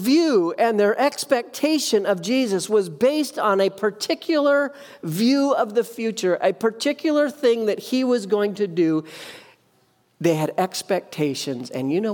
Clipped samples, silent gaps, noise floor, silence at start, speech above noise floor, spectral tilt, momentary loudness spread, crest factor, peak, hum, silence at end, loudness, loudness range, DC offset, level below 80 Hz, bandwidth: under 0.1%; none; -62 dBFS; 0 s; 41 dB; -4.5 dB/octave; 7 LU; 16 dB; -6 dBFS; none; 0 s; -21 LUFS; 4 LU; under 0.1%; -74 dBFS; 19 kHz